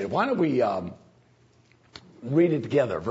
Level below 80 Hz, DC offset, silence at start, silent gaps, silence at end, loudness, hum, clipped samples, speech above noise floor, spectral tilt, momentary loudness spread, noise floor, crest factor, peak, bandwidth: -64 dBFS; under 0.1%; 0 s; none; 0 s; -25 LUFS; none; under 0.1%; 36 dB; -8 dB/octave; 13 LU; -60 dBFS; 16 dB; -10 dBFS; 8 kHz